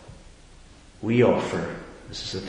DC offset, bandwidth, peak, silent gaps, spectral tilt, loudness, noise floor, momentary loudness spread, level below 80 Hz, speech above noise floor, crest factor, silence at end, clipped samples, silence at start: under 0.1%; 10.5 kHz; -6 dBFS; none; -6 dB/octave; -24 LUFS; -49 dBFS; 17 LU; -50 dBFS; 25 dB; 22 dB; 0 s; under 0.1%; 0 s